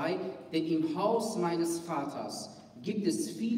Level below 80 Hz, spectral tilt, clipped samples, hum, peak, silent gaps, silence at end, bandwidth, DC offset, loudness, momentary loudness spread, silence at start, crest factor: -76 dBFS; -5 dB/octave; under 0.1%; none; -16 dBFS; none; 0 s; 16 kHz; under 0.1%; -33 LUFS; 10 LU; 0 s; 16 dB